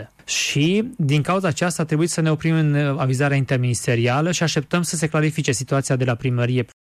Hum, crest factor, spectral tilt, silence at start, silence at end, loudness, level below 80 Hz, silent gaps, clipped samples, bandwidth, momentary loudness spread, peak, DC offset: none; 12 dB; -5 dB/octave; 0 s; 0.25 s; -20 LUFS; -56 dBFS; none; under 0.1%; 14 kHz; 3 LU; -8 dBFS; under 0.1%